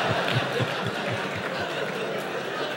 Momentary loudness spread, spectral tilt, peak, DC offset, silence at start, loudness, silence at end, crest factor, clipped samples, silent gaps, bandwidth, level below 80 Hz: 5 LU; -5 dB/octave; -10 dBFS; under 0.1%; 0 s; -28 LUFS; 0 s; 16 dB; under 0.1%; none; 16.5 kHz; -62 dBFS